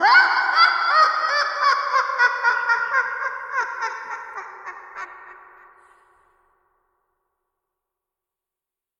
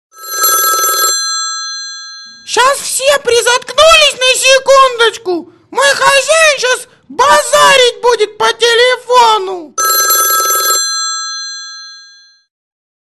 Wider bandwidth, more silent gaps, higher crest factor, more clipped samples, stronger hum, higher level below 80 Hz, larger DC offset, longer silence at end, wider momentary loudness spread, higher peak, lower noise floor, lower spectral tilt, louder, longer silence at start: second, 10 kHz vs 13 kHz; neither; first, 20 dB vs 10 dB; neither; second, none vs 60 Hz at -60 dBFS; second, -72 dBFS vs -48 dBFS; neither; first, 3.65 s vs 1.1 s; first, 20 LU vs 14 LU; about the same, -2 dBFS vs 0 dBFS; first, -88 dBFS vs -41 dBFS; about the same, 1 dB/octave vs 1 dB/octave; second, -19 LUFS vs -9 LUFS; second, 0 s vs 0.2 s